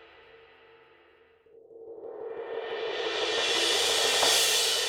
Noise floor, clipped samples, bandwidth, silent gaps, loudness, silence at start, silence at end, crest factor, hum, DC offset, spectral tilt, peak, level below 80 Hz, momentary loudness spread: -60 dBFS; under 0.1%; over 20 kHz; none; -25 LUFS; 0 s; 0 s; 20 dB; none; under 0.1%; 1 dB/octave; -10 dBFS; -74 dBFS; 20 LU